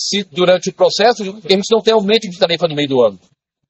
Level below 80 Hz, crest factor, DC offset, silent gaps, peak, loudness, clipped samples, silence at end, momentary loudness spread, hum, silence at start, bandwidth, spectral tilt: -60 dBFS; 14 dB; under 0.1%; none; 0 dBFS; -14 LUFS; under 0.1%; 0.55 s; 4 LU; none; 0 s; 8.2 kHz; -4 dB/octave